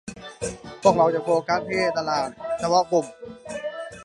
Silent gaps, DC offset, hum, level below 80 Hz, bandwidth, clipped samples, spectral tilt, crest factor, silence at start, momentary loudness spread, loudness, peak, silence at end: none; under 0.1%; none; -56 dBFS; 11.5 kHz; under 0.1%; -4.5 dB/octave; 20 dB; 0.05 s; 14 LU; -23 LUFS; -4 dBFS; 0 s